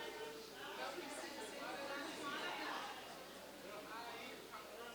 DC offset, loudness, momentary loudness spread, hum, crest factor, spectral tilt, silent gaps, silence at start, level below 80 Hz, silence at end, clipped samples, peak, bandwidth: under 0.1%; -48 LUFS; 8 LU; none; 16 dB; -2 dB/octave; none; 0 s; -78 dBFS; 0 s; under 0.1%; -32 dBFS; over 20 kHz